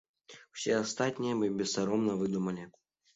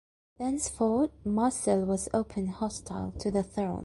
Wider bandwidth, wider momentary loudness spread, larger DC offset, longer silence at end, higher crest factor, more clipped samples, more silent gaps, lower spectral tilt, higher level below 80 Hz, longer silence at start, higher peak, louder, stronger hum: second, 8.2 kHz vs 11.5 kHz; first, 10 LU vs 7 LU; neither; first, 0.45 s vs 0 s; about the same, 18 dB vs 16 dB; neither; neither; second, -4.5 dB/octave vs -6 dB/octave; second, -70 dBFS vs -52 dBFS; about the same, 0.3 s vs 0.4 s; about the same, -16 dBFS vs -14 dBFS; about the same, -32 LUFS vs -30 LUFS; neither